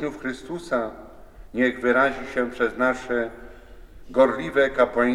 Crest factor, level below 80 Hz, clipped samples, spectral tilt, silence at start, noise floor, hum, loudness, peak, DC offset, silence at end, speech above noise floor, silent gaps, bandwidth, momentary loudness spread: 18 dB; -48 dBFS; under 0.1%; -5.5 dB/octave; 0 s; -44 dBFS; none; -23 LUFS; -6 dBFS; under 0.1%; 0 s; 21 dB; none; 12 kHz; 13 LU